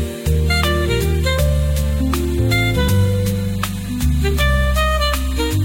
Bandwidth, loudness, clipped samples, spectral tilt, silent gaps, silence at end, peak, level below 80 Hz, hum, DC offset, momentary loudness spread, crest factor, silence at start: 17.5 kHz; -18 LUFS; under 0.1%; -5.5 dB/octave; none; 0 s; -4 dBFS; -20 dBFS; none; under 0.1%; 4 LU; 12 dB; 0 s